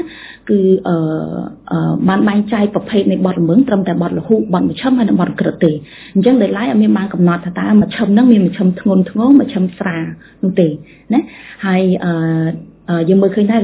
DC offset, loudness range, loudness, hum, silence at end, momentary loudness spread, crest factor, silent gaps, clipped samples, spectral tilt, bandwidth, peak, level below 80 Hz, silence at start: under 0.1%; 3 LU; -14 LUFS; none; 0 s; 10 LU; 14 dB; none; under 0.1%; -12 dB/octave; 4 kHz; 0 dBFS; -48 dBFS; 0 s